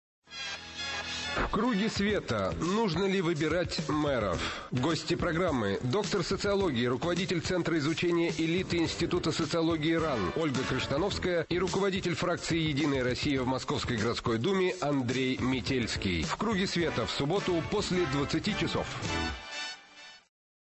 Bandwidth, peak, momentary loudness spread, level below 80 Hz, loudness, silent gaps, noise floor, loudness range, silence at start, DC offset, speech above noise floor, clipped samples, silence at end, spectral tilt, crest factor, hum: 8.6 kHz; -18 dBFS; 5 LU; -48 dBFS; -30 LUFS; none; -52 dBFS; 1 LU; 0.3 s; under 0.1%; 22 dB; under 0.1%; 0.45 s; -5 dB/octave; 12 dB; none